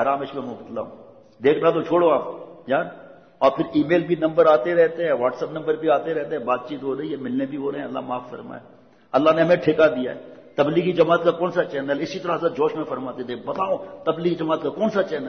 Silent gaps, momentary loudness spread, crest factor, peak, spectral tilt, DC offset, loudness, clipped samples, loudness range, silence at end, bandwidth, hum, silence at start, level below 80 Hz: none; 14 LU; 16 dB; -4 dBFS; -7.5 dB/octave; under 0.1%; -22 LUFS; under 0.1%; 5 LU; 0 s; 6.4 kHz; none; 0 s; -64 dBFS